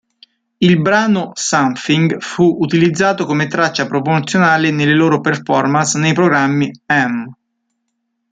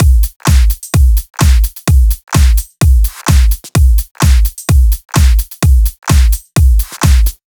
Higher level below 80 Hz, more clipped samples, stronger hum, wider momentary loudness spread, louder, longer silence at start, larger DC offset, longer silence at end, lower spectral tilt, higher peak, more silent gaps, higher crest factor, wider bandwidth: second, -56 dBFS vs -10 dBFS; neither; neither; first, 5 LU vs 2 LU; about the same, -14 LUFS vs -12 LUFS; first, 0.6 s vs 0 s; neither; first, 1 s vs 0.15 s; about the same, -5 dB/octave vs -5 dB/octave; about the same, -2 dBFS vs 0 dBFS; second, none vs 0.36-0.40 s, 4.11-4.15 s; first, 14 dB vs 8 dB; second, 9.4 kHz vs over 20 kHz